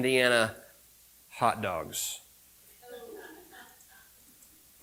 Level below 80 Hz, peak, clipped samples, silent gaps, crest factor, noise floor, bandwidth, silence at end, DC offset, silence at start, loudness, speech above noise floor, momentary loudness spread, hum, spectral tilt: -68 dBFS; -10 dBFS; under 0.1%; none; 24 dB; -59 dBFS; 17.5 kHz; 1.2 s; under 0.1%; 0 s; -29 LUFS; 31 dB; 27 LU; none; -3 dB/octave